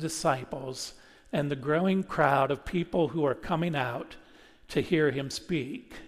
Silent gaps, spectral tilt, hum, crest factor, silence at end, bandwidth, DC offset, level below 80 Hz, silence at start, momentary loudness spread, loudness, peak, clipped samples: none; -5.5 dB/octave; none; 20 dB; 0 s; 15 kHz; under 0.1%; -54 dBFS; 0 s; 12 LU; -29 LUFS; -8 dBFS; under 0.1%